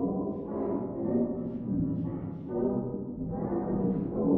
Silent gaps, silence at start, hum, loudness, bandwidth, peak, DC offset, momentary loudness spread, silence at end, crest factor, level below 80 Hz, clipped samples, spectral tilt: none; 0 s; none; -32 LUFS; 2.9 kHz; -14 dBFS; under 0.1%; 6 LU; 0 s; 18 dB; -52 dBFS; under 0.1%; -12.5 dB/octave